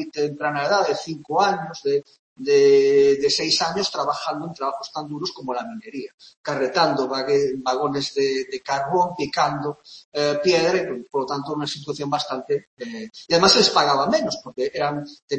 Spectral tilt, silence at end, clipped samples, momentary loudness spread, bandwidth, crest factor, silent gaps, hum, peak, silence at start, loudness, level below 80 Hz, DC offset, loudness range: -3.5 dB/octave; 0 s; under 0.1%; 15 LU; 8.6 kHz; 20 dB; 2.19-2.36 s, 6.14-6.18 s, 6.37-6.44 s, 10.04-10.12 s, 12.67-12.77 s, 15.22-15.28 s; none; -2 dBFS; 0 s; -21 LUFS; -62 dBFS; under 0.1%; 5 LU